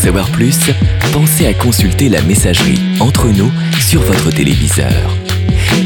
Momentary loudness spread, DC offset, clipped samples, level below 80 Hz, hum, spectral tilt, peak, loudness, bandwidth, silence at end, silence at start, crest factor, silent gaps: 3 LU; under 0.1%; under 0.1%; -22 dBFS; none; -5 dB/octave; 0 dBFS; -11 LUFS; 19.5 kHz; 0 s; 0 s; 10 dB; none